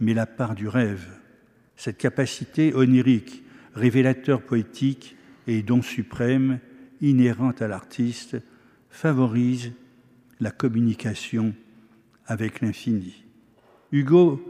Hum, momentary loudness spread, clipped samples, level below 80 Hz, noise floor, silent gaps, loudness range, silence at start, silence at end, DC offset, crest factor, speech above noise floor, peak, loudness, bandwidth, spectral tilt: none; 15 LU; under 0.1%; -64 dBFS; -57 dBFS; none; 5 LU; 0 s; 0 s; under 0.1%; 18 dB; 35 dB; -6 dBFS; -23 LUFS; 12.5 kHz; -7.5 dB/octave